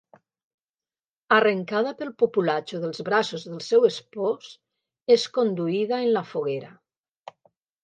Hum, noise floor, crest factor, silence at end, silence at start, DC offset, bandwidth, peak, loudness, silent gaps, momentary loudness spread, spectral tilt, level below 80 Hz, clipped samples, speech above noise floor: none; under -90 dBFS; 20 dB; 1.15 s; 1.3 s; under 0.1%; 9 kHz; -6 dBFS; -24 LUFS; none; 10 LU; -5 dB/octave; -78 dBFS; under 0.1%; over 67 dB